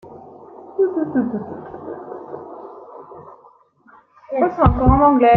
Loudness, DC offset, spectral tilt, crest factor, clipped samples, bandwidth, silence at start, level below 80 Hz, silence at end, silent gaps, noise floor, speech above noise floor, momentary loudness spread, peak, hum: -18 LUFS; under 0.1%; -11 dB/octave; 18 dB; under 0.1%; 4.2 kHz; 0.05 s; -32 dBFS; 0 s; none; -51 dBFS; 35 dB; 27 LU; 0 dBFS; none